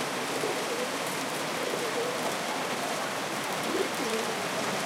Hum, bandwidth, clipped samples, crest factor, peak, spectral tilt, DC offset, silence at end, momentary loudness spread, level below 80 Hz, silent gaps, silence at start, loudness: none; 17 kHz; under 0.1%; 16 dB; -16 dBFS; -2.5 dB/octave; under 0.1%; 0 s; 2 LU; -78 dBFS; none; 0 s; -30 LUFS